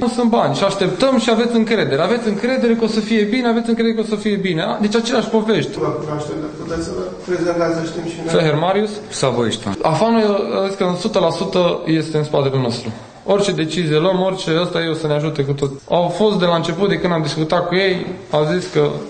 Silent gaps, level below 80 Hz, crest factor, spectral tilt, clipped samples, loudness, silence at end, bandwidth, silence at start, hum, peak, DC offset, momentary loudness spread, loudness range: none; -48 dBFS; 14 dB; -5.5 dB/octave; under 0.1%; -17 LUFS; 0 s; 9.4 kHz; 0 s; none; -2 dBFS; under 0.1%; 7 LU; 3 LU